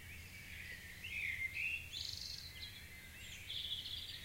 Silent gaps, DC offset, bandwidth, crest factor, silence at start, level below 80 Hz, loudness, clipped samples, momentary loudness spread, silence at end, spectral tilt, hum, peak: none; under 0.1%; 16 kHz; 18 dB; 0 s; -62 dBFS; -44 LUFS; under 0.1%; 12 LU; 0 s; -1 dB/octave; none; -30 dBFS